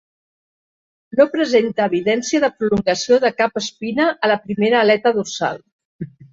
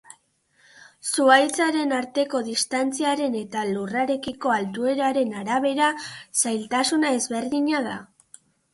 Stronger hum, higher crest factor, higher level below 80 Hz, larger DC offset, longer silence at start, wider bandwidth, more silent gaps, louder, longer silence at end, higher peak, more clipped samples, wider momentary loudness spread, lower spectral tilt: neither; about the same, 16 dB vs 20 dB; first, -56 dBFS vs -68 dBFS; neither; about the same, 1.15 s vs 1.05 s; second, 7.8 kHz vs 12 kHz; first, 5.72-5.79 s, 5.85-5.99 s vs none; first, -17 LUFS vs -23 LUFS; second, 0.25 s vs 0.7 s; about the same, -2 dBFS vs -4 dBFS; neither; about the same, 9 LU vs 7 LU; first, -4.5 dB/octave vs -2.5 dB/octave